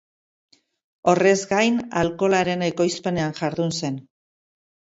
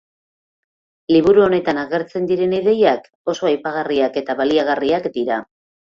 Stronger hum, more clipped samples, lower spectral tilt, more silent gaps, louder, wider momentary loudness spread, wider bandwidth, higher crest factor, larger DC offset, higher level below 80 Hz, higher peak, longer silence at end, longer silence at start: neither; neither; about the same, -5 dB/octave vs -6 dB/octave; second, none vs 3.15-3.25 s; second, -22 LUFS vs -18 LUFS; about the same, 7 LU vs 9 LU; first, 8 kHz vs 7.2 kHz; about the same, 18 dB vs 16 dB; neither; about the same, -58 dBFS vs -56 dBFS; about the same, -4 dBFS vs -2 dBFS; first, 0.95 s vs 0.5 s; about the same, 1.05 s vs 1.1 s